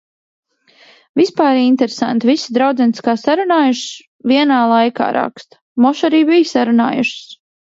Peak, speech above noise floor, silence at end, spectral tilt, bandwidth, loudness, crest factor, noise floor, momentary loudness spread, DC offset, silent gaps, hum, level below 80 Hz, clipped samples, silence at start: 0 dBFS; 35 dB; 0.4 s; -4.5 dB/octave; 7.8 kHz; -14 LUFS; 14 dB; -49 dBFS; 10 LU; under 0.1%; 4.07-4.19 s, 5.61-5.76 s; none; -66 dBFS; under 0.1%; 1.15 s